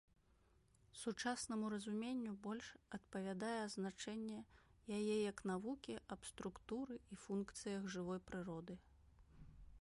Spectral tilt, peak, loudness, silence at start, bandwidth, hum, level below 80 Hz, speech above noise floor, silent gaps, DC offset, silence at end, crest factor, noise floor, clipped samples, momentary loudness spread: -5 dB/octave; -30 dBFS; -47 LUFS; 0.95 s; 11.5 kHz; none; -72 dBFS; 28 dB; none; under 0.1%; 0 s; 18 dB; -75 dBFS; under 0.1%; 13 LU